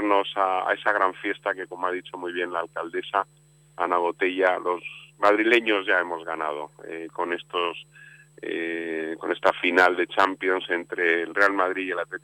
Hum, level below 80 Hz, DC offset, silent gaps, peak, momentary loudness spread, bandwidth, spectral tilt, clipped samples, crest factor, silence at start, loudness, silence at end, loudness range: none; -72 dBFS; under 0.1%; none; -6 dBFS; 12 LU; 14.5 kHz; -4 dB/octave; under 0.1%; 20 dB; 0 s; -24 LUFS; 0.05 s; 6 LU